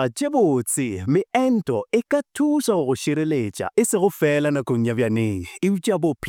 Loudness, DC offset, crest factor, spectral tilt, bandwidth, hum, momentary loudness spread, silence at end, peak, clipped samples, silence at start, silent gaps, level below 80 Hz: -21 LUFS; under 0.1%; 14 dB; -5.5 dB/octave; 19 kHz; none; 4 LU; 0 s; -6 dBFS; under 0.1%; 0 s; none; -58 dBFS